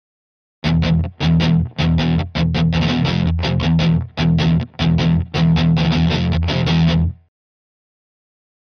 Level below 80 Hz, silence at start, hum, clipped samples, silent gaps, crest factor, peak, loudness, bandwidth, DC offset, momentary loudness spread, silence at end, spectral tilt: -30 dBFS; 0.65 s; none; under 0.1%; none; 12 dB; -6 dBFS; -17 LUFS; 6.6 kHz; under 0.1%; 3 LU; 1.5 s; -7.5 dB/octave